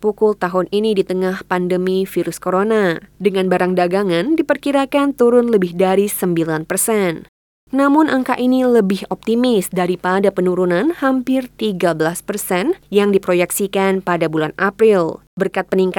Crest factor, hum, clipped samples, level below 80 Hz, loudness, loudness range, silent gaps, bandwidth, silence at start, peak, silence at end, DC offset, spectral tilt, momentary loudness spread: 14 dB; none; under 0.1%; -54 dBFS; -16 LUFS; 2 LU; 7.28-7.67 s, 15.27-15.37 s; 19 kHz; 0 s; -2 dBFS; 0 s; under 0.1%; -5.5 dB/octave; 6 LU